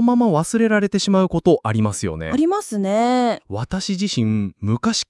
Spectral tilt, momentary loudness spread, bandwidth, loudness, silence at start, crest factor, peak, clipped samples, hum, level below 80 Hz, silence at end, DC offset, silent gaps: -5.5 dB/octave; 6 LU; 12 kHz; -19 LUFS; 0 s; 16 dB; -4 dBFS; under 0.1%; none; -48 dBFS; 0.05 s; under 0.1%; none